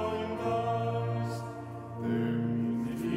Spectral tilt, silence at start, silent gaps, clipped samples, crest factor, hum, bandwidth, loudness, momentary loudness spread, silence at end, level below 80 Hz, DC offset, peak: -8 dB/octave; 0 s; none; under 0.1%; 12 dB; none; 15 kHz; -33 LUFS; 9 LU; 0 s; -60 dBFS; under 0.1%; -20 dBFS